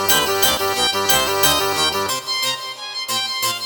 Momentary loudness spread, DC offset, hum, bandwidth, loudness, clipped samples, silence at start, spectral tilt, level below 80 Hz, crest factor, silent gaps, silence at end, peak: 7 LU; under 0.1%; none; 19.5 kHz; -17 LUFS; under 0.1%; 0 s; -1 dB/octave; -46 dBFS; 18 dB; none; 0 s; -2 dBFS